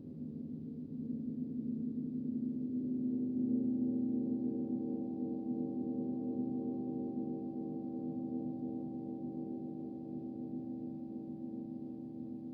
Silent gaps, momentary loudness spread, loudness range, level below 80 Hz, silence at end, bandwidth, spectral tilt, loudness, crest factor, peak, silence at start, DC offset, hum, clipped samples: none; 10 LU; 6 LU; -74 dBFS; 0 s; 1.2 kHz; -13.5 dB/octave; -39 LUFS; 14 dB; -26 dBFS; 0 s; under 0.1%; none; under 0.1%